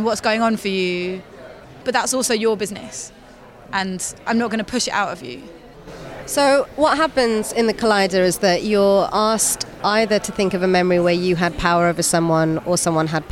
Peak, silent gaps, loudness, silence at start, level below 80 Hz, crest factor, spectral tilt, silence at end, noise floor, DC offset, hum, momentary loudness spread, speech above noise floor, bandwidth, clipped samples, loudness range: -4 dBFS; none; -18 LUFS; 0 s; -46 dBFS; 16 dB; -4 dB/octave; 0 s; -43 dBFS; under 0.1%; none; 12 LU; 24 dB; 17 kHz; under 0.1%; 6 LU